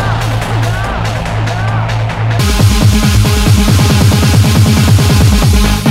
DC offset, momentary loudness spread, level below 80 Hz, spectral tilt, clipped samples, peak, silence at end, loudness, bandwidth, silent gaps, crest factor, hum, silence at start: under 0.1%; 7 LU; -16 dBFS; -5.5 dB/octave; 0.5%; 0 dBFS; 0 s; -10 LUFS; 16.5 kHz; none; 8 dB; none; 0 s